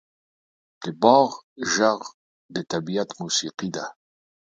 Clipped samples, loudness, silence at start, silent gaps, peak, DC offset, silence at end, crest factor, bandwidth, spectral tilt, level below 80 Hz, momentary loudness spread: under 0.1%; -23 LUFS; 0.8 s; 1.43-1.56 s, 2.14-2.49 s; 0 dBFS; under 0.1%; 0.55 s; 24 dB; 9.4 kHz; -3.5 dB/octave; -68 dBFS; 18 LU